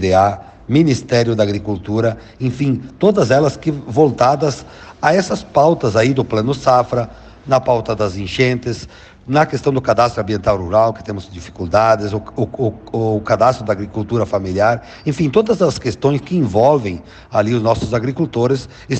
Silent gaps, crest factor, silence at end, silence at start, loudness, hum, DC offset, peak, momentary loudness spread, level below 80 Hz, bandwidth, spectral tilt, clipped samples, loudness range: none; 14 dB; 0 s; 0 s; -16 LUFS; none; under 0.1%; -2 dBFS; 9 LU; -42 dBFS; 8.8 kHz; -6.5 dB/octave; under 0.1%; 2 LU